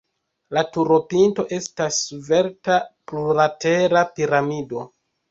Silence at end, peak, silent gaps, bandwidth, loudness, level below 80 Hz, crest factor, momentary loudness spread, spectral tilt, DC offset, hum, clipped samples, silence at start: 0.45 s; -4 dBFS; none; 8 kHz; -20 LUFS; -60 dBFS; 18 dB; 10 LU; -4.5 dB/octave; under 0.1%; none; under 0.1%; 0.5 s